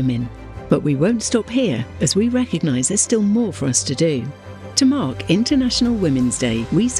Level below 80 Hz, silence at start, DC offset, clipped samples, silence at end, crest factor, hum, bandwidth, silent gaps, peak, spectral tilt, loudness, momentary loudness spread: -42 dBFS; 0 s; under 0.1%; under 0.1%; 0 s; 18 dB; none; 12.5 kHz; none; -2 dBFS; -4.5 dB/octave; -18 LUFS; 5 LU